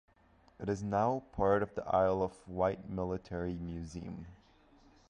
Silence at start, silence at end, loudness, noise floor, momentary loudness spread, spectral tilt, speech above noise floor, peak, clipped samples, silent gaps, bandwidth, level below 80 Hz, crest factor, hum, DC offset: 0.6 s; 0.75 s; -35 LUFS; -66 dBFS; 13 LU; -7.5 dB/octave; 31 dB; -16 dBFS; under 0.1%; none; 10 kHz; -54 dBFS; 18 dB; none; under 0.1%